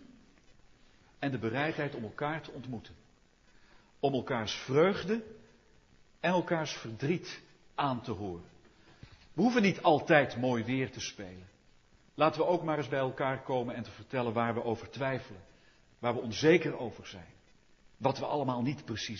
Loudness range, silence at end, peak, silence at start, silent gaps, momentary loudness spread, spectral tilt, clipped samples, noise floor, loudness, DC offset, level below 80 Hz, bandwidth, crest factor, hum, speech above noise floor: 6 LU; 0 s; -8 dBFS; 0 s; none; 17 LU; -6 dB/octave; under 0.1%; -64 dBFS; -32 LUFS; under 0.1%; -66 dBFS; 7.4 kHz; 26 dB; none; 32 dB